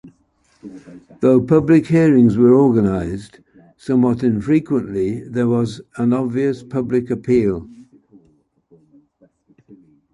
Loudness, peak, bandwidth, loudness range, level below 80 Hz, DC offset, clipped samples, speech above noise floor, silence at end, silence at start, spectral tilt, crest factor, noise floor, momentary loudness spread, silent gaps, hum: -16 LUFS; -2 dBFS; 11 kHz; 8 LU; -46 dBFS; under 0.1%; under 0.1%; 44 dB; 2.3 s; 0.05 s; -9 dB/octave; 16 dB; -60 dBFS; 12 LU; none; none